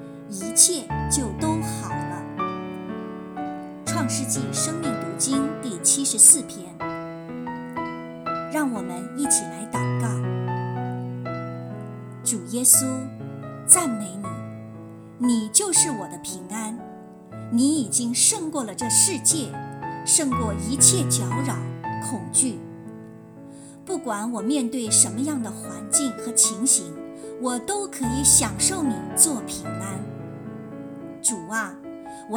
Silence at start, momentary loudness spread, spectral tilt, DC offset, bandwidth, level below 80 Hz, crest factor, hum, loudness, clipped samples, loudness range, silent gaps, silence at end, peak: 0 s; 20 LU; -3 dB/octave; under 0.1%; 19.5 kHz; -50 dBFS; 24 dB; none; -21 LUFS; under 0.1%; 8 LU; none; 0 s; 0 dBFS